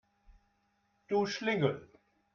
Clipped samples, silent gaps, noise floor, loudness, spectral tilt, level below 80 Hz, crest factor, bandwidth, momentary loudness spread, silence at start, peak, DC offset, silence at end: under 0.1%; none; -75 dBFS; -33 LUFS; -5.5 dB/octave; -70 dBFS; 22 dB; 7.2 kHz; 5 LU; 0.3 s; -16 dBFS; under 0.1%; 0.5 s